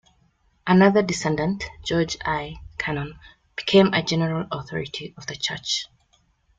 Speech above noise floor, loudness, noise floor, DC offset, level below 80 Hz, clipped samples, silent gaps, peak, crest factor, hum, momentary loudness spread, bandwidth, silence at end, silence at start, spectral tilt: 41 dB; -23 LUFS; -64 dBFS; under 0.1%; -50 dBFS; under 0.1%; none; -4 dBFS; 20 dB; none; 16 LU; 9 kHz; 0.75 s; 0.65 s; -5 dB/octave